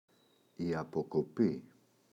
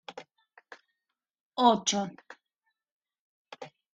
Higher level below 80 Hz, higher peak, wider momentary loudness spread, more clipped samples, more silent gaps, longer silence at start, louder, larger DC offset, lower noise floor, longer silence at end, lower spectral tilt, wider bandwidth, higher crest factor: first, -68 dBFS vs -78 dBFS; second, -18 dBFS vs -8 dBFS; second, 8 LU vs 24 LU; neither; second, none vs 1.41-1.51 s, 2.92-3.00 s, 3.19-3.45 s; first, 0.6 s vs 0.1 s; second, -36 LUFS vs -27 LUFS; neither; second, -69 dBFS vs -87 dBFS; first, 0.5 s vs 0.25 s; first, -8.5 dB/octave vs -3 dB/octave; second, 8.4 kHz vs 9.4 kHz; second, 18 dB vs 26 dB